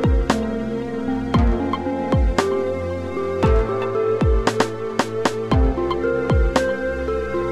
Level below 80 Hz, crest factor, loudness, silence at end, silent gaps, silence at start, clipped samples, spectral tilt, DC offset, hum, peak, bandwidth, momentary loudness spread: -24 dBFS; 18 dB; -21 LUFS; 0 s; none; 0 s; under 0.1%; -6.5 dB/octave; under 0.1%; none; -2 dBFS; 12 kHz; 6 LU